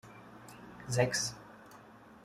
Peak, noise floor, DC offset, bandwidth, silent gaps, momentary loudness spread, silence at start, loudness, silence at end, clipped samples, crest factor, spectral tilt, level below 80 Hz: -14 dBFS; -56 dBFS; under 0.1%; 15 kHz; none; 24 LU; 0.05 s; -33 LUFS; 0.1 s; under 0.1%; 24 dB; -3.5 dB/octave; -66 dBFS